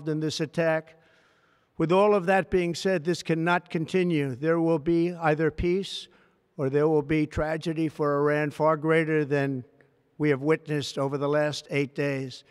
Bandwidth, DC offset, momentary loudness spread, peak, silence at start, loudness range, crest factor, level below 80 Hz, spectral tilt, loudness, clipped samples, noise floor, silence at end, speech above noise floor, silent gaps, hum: 13 kHz; under 0.1%; 6 LU; -8 dBFS; 0 s; 2 LU; 18 dB; -52 dBFS; -6.5 dB/octave; -26 LUFS; under 0.1%; -65 dBFS; 0.1 s; 39 dB; none; none